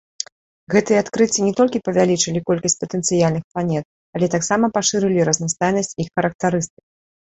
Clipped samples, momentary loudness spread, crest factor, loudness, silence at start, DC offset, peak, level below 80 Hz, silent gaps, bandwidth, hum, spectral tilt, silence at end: under 0.1%; 7 LU; 18 dB; -19 LUFS; 0.7 s; under 0.1%; -2 dBFS; -54 dBFS; 3.44-3.55 s, 3.85-4.13 s, 6.35-6.39 s; 8.4 kHz; none; -4.5 dB/octave; 0.55 s